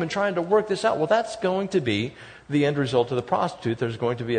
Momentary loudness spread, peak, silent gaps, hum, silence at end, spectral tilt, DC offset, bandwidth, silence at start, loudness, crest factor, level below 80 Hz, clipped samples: 6 LU; -8 dBFS; none; none; 0 s; -6 dB/octave; under 0.1%; 9.6 kHz; 0 s; -24 LUFS; 16 dB; -60 dBFS; under 0.1%